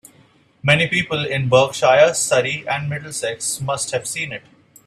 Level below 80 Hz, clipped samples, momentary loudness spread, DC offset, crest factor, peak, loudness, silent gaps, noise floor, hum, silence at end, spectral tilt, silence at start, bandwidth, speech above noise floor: -56 dBFS; under 0.1%; 11 LU; under 0.1%; 20 dB; 0 dBFS; -18 LUFS; none; -54 dBFS; none; 0.45 s; -3.5 dB/octave; 0.65 s; 15 kHz; 35 dB